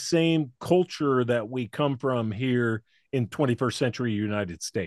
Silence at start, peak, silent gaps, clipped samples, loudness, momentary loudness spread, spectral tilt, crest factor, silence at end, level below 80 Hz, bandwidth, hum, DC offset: 0 s; -8 dBFS; none; under 0.1%; -27 LUFS; 7 LU; -6 dB/octave; 18 dB; 0 s; -66 dBFS; 12.5 kHz; none; under 0.1%